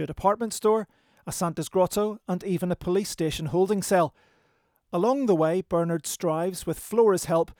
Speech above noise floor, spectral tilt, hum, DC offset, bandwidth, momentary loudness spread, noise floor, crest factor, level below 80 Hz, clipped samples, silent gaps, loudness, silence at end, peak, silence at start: 43 dB; -5.5 dB/octave; none; under 0.1%; over 20 kHz; 7 LU; -68 dBFS; 16 dB; -54 dBFS; under 0.1%; none; -26 LUFS; 0.05 s; -8 dBFS; 0 s